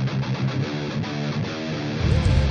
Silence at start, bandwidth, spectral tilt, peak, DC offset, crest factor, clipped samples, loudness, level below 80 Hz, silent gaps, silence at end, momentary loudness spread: 0 s; 9.4 kHz; -7 dB/octave; -6 dBFS; under 0.1%; 16 dB; under 0.1%; -25 LUFS; -30 dBFS; none; 0 s; 7 LU